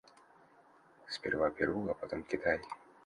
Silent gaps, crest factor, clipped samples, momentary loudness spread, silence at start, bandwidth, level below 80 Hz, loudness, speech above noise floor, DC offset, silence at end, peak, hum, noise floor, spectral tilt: none; 20 dB; under 0.1%; 9 LU; 1.05 s; 11 kHz; -62 dBFS; -36 LUFS; 28 dB; under 0.1%; 0.3 s; -18 dBFS; none; -64 dBFS; -5.5 dB/octave